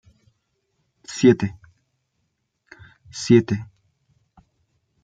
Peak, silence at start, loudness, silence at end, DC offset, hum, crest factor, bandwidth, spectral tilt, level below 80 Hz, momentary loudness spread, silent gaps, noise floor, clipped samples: -2 dBFS; 1.1 s; -20 LUFS; 1.4 s; under 0.1%; none; 22 dB; 9.2 kHz; -6.5 dB/octave; -60 dBFS; 17 LU; none; -74 dBFS; under 0.1%